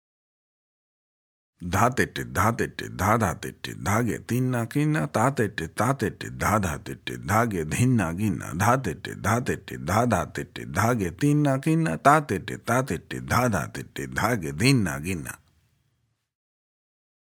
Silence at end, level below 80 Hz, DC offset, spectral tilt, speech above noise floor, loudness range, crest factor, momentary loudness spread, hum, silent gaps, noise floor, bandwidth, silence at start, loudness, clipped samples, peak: 1.85 s; -50 dBFS; under 0.1%; -5.5 dB/octave; 48 dB; 3 LU; 22 dB; 10 LU; none; none; -73 dBFS; 19.5 kHz; 1.6 s; -25 LUFS; under 0.1%; -4 dBFS